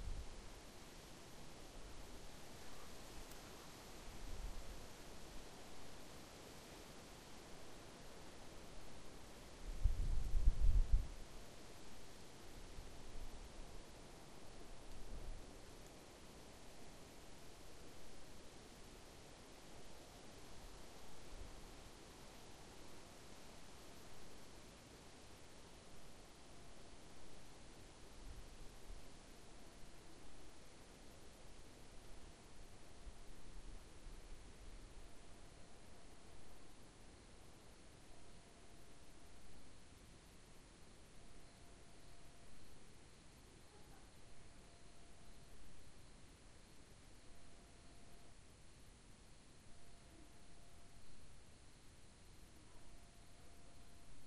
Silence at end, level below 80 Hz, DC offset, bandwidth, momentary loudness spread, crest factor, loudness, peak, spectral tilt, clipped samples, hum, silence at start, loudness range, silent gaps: 0 s; -50 dBFS; under 0.1%; 13 kHz; 8 LU; 28 dB; -56 LUFS; -22 dBFS; -4.5 dB/octave; under 0.1%; none; 0 s; 17 LU; none